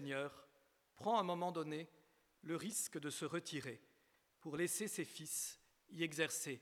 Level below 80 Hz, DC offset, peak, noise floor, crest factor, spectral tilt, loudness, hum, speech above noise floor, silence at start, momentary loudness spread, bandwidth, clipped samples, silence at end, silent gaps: -88 dBFS; under 0.1%; -24 dBFS; -77 dBFS; 22 dB; -3.5 dB/octave; -43 LUFS; none; 34 dB; 0 s; 16 LU; 18.5 kHz; under 0.1%; 0 s; none